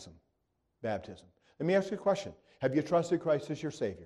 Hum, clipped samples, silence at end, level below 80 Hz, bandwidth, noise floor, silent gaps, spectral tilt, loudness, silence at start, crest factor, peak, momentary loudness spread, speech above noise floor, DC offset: none; under 0.1%; 0 s; -68 dBFS; 11 kHz; -80 dBFS; none; -6.5 dB/octave; -33 LUFS; 0 s; 18 dB; -16 dBFS; 11 LU; 48 dB; under 0.1%